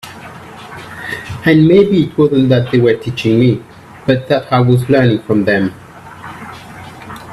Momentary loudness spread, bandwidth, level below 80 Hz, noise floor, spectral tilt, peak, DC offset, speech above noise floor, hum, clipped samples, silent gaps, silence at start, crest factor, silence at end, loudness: 21 LU; 13.5 kHz; -46 dBFS; -32 dBFS; -8 dB/octave; 0 dBFS; under 0.1%; 21 dB; none; under 0.1%; none; 0.05 s; 14 dB; 0 s; -12 LUFS